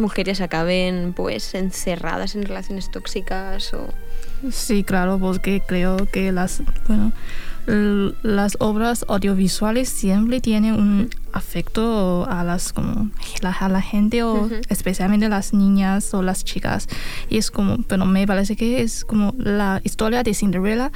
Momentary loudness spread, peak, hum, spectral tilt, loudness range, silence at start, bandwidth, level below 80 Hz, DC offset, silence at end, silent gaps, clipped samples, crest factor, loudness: 10 LU; -4 dBFS; none; -5.5 dB/octave; 5 LU; 0 s; 16 kHz; -26 dBFS; under 0.1%; 0 s; none; under 0.1%; 14 dB; -21 LUFS